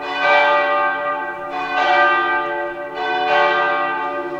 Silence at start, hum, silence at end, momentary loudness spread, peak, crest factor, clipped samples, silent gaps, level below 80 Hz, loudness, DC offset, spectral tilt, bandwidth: 0 s; none; 0 s; 10 LU; -2 dBFS; 16 dB; under 0.1%; none; -58 dBFS; -17 LUFS; under 0.1%; -3.5 dB/octave; 8 kHz